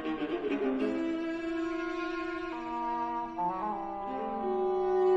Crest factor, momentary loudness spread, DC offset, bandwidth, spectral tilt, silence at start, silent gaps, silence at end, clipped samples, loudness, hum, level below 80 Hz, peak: 14 dB; 6 LU; under 0.1%; 7.8 kHz; -6.5 dB/octave; 0 s; none; 0 s; under 0.1%; -33 LUFS; none; -58 dBFS; -18 dBFS